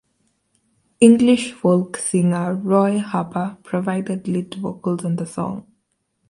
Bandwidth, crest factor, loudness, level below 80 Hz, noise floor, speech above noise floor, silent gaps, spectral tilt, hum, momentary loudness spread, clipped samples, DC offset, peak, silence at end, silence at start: 11.5 kHz; 20 dB; -19 LUFS; -62 dBFS; -70 dBFS; 52 dB; none; -6 dB/octave; none; 12 LU; under 0.1%; under 0.1%; 0 dBFS; 0.7 s; 1 s